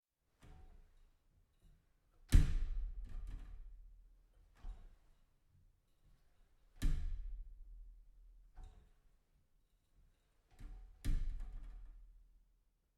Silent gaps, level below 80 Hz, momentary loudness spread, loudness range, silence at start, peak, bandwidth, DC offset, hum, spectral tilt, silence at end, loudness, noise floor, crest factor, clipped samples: none; -44 dBFS; 27 LU; 21 LU; 0.45 s; -14 dBFS; 12.5 kHz; under 0.1%; none; -6 dB/octave; 0.85 s; -43 LUFS; -76 dBFS; 28 dB; under 0.1%